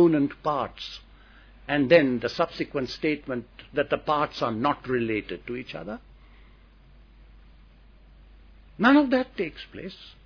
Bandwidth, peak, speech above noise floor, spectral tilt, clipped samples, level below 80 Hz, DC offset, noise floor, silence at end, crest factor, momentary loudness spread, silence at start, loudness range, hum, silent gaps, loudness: 5.4 kHz; -4 dBFS; 27 dB; -7 dB/octave; under 0.1%; -52 dBFS; under 0.1%; -53 dBFS; 0.15 s; 22 dB; 20 LU; 0 s; 12 LU; none; none; -25 LUFS